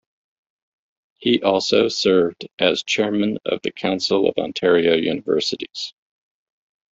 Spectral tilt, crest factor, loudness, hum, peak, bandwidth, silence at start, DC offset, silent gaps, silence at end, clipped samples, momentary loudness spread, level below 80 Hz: -4 dB/octave; 20 dB; -20 LUFS; none; -2 dBFS; 7.8 kHz; 1.2 s; under 0.1%; 2.53-2.58 s; 1 s; under 0.1%; 8 LU; -60 dBFS